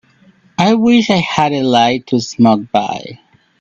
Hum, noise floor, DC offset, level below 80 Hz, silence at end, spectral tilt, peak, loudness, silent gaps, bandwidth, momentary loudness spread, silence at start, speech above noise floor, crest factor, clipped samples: none; -49 dBFS; under 0.1%; -52 dBFS; 0.45 s; -5.5 dB/octave; 0 dBFS; -13 LUFS; none; 7.6 kHz; 12 LU; 0.6 s; 36 dB; 14 dB; under 0.1%